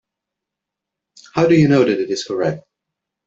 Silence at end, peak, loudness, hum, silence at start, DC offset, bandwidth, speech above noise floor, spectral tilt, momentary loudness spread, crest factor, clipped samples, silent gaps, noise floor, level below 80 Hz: 0.65 s; -2 dBFS; -16 LUFS; none; 1.35 s; under 0.1%; 8 kHz; 68 dB; -6.5 dB/octave; 12 LU; 16 dB; under 0.1%; none; -83 dBFS; -54 dBFS